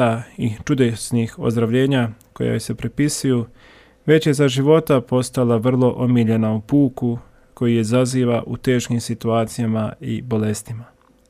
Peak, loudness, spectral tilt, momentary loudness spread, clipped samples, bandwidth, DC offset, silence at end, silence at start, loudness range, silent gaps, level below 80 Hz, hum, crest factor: -2 dBFS; -19 LUFS; -6.5 dB/octave; 9 LU; under 0.1%; 15 kHz; under 0.1%; 0.45 s; 0 s; 3 LU; none; -50 dBFS; none; 16 dB